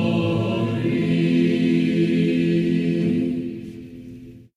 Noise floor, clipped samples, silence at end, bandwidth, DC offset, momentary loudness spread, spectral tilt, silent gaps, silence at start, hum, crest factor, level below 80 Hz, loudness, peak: -40 dBFS; under 0.1%; 0.15 s; 10 kHz; under 0.1%; 19 LU; -8 dB/octave; none; 0 s; none; 12 dB; -52 dBFS; -21 LUFS; -8 dBFS